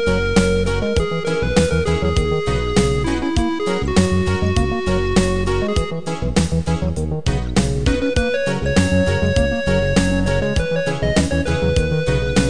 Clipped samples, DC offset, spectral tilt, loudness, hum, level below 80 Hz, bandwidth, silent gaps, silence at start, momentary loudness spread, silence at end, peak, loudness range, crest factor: under 0.1%; 3%; -5.5 dB/octave; -19 LUFS; none; -26 dBFS; 10 kHz; none; 0 s; 4 LU; 0 s; 0 dBFS; 2 LU; 16 dB